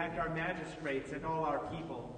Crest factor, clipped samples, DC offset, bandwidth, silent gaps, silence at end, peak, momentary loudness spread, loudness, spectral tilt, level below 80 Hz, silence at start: 16 dB; under 0.1%; under 0.1%; 9.4 kHz; none; 0 s; -22 dBFS; 5 LU; -38 LUFS; -6.5 dB/octave; -58 dBFS; 0 s